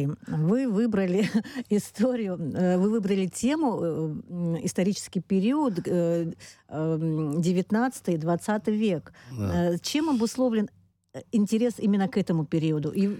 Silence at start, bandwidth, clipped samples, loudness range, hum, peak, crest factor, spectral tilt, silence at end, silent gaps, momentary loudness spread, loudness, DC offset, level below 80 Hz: 0 s; 15.5 kHz; under 0.1%; 2 LU; none; -12 dBFS; 12 dB; -6.5 dB/octave; 0 s; none; 7 LU; -26 LUFS; under 0.1%; -60 dBFS